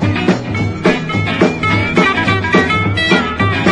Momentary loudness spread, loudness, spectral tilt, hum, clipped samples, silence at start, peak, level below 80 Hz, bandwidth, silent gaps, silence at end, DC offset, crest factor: 4 LU; -13 LUFS; -6 dB/octave; none; under 0.1%; 0 s; 0 dBFS; -38 dBFS; 10.5 kHz; none; 0 s; under 0.1%; 14 dB